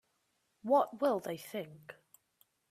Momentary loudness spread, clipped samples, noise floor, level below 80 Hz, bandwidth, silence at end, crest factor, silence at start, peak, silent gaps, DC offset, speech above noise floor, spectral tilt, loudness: 21 LU; under 0.1%; -79 dBFS; -84 dBFS; 15 kHz; 0.8 s; 20 dB; 0.65 s; -18 dBFS; none; under 0.1%; 45 dB; -5.5 dB/octave; -34 LUFS